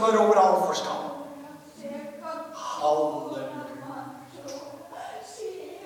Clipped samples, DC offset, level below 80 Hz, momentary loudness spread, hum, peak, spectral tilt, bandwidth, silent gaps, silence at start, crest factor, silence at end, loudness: under 0.1%; under 0.1%; -76 dBFS; 22 LU; none; -8 dBFS; -4 dB/octave; 18.5 kHz; none; 0 s; 20 dB; 0 s; -26 LUFS